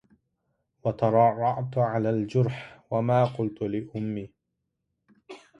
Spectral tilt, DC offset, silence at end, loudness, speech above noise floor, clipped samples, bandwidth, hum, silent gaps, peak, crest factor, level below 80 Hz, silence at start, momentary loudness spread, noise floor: -9 dB/octave; under 0.1%; 0.2 s; -26 LUFS; 56 dB; under 0.1%; 7.8 kHz; none; none; -8 dBFS; 20 dB; -62 dBFS; 0.85 s; 11 LU; -81 dBFS